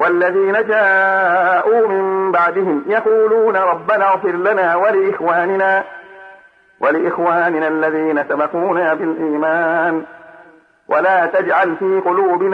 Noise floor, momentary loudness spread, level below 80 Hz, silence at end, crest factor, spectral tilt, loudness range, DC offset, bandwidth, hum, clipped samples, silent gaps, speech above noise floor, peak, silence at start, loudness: -46 dBFS; 5 LU; -68 dBFS; 0 s; 12 dB; -7.5 dB/octave; 3 LU; under 0.1%; 5.4 kHz; none; under 0.1%; none; 31 dB; -4 dBFS; 0 s; -15 LUFS